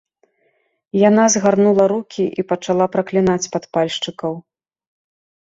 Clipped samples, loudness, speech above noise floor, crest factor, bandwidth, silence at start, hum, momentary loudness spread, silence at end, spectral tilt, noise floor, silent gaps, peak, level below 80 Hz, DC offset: under 0.1%; -17 LUFS; 48 dB; 16 dB; 7.8 kHz; 0.95 s; none; 11 LU; 1.05 s; -4.5 dB/octave; -64 dBFS; none; -2 dBFS; -58 dBFS; under 0.1%